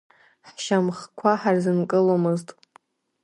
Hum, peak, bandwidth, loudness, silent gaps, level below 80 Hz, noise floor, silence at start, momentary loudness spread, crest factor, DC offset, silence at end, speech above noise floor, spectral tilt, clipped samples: none; -4 dBFS; 11.5 kHz; -23 LUFS; none; -74 dBFS; -58 dBFS; 0.45 s; 8 LU; 18 dB; under 0.1%; 0.75 s; 36 dB; -6.5 dB/octave; under 0.1%